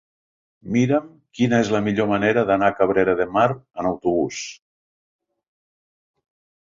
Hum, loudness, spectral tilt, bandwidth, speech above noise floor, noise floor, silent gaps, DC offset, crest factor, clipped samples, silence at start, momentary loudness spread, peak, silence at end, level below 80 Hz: none; -20 LUFS; -6 dB/octave; 7.6 kHz; over 70 dB; under -90 dBFS; none; under 0.1%; 18 dB; under 0.1%; 0.65 s; 8 LU; -4 dBFS; 2.1 s; -54 dBFS